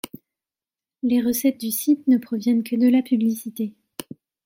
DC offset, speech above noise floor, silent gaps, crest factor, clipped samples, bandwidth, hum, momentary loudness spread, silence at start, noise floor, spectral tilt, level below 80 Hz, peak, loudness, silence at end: under 0.1%; over 70 dB; none; 14 dB; under 0.1%; 16.5 kHz; none; 17 LU; 0.05 s; under -90 dBFS; -5 dB/octave; -66 dBFS; -8 dBFS; -21 LUFS; 0.45 s